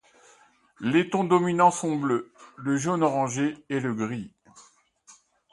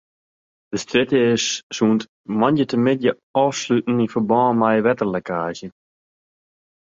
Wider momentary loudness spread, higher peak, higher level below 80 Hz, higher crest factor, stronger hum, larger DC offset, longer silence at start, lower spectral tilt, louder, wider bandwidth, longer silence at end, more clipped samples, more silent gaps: first, 12 LU vs 9 LU; about the same, -6 dBFS vs -4 dBFS; second, -70 dBFS vs -60 dBFS; about the same, 20 dB vs 18 dB; neither; neither; about the same, 0.8 s vs 0.7 s; about the same, -5.5 dB/octave vs -5 dB/octave; second, -25 LUFS vs -19 LUFS; first, 11.5 kHz vs 7.8 kHz; second, 0.4 s vs 1.15 s; neither; second, none vs 1.63-1.70 s, 2.09-2.24 s, 3.23-3.34 s